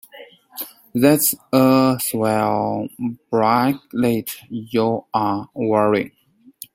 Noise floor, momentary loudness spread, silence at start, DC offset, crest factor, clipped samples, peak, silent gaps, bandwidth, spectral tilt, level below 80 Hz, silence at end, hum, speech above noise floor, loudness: -44 dBFS; 16 LU; 0.15 s; under 0.1%; 18 dB; under 0.1%; -2 dBFS; none; 16.5 kHz; -5 dB/octave; -60 dBFS; 0.65 s; none; 25 dB; -19 LUFS